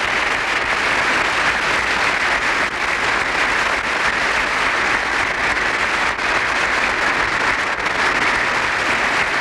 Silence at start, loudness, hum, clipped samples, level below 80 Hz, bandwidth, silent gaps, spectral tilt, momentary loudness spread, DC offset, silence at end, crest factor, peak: 0 s; -17 LUFS; none; under 0.1%; -42 dBFS; 15 kHz; none; -2 dB/octave; 2 LU; under 0.1%; 0 s; 12 dB; -6 dBFS